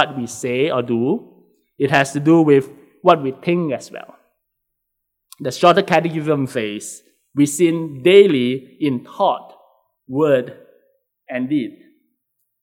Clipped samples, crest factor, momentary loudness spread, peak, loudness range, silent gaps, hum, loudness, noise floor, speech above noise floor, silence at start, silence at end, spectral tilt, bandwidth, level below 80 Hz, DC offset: under 0.1%; 18 dB; 16 LU; 0 dBFS; 6 LU; none; none; -17 LUFS; -76 dBFS; 59 dB; 0 s; 0.9 s; -5.5 dB/octave; 15.5 kHz; -68 dBFS; under 0.1%